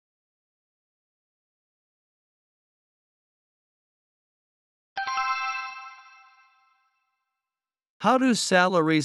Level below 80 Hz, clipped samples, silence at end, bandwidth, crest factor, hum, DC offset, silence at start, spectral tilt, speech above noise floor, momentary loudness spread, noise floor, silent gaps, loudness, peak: -80 dBFS; under 0.1%; 0 s; 12.5 kHz; 24 dB; none; under 0.1%; 4.95 s; -4 dB/octave; over 69 dB; 18 LU; under -90 dBFS; 7.90-8.00 s; -24 LUFS; -6 dBFS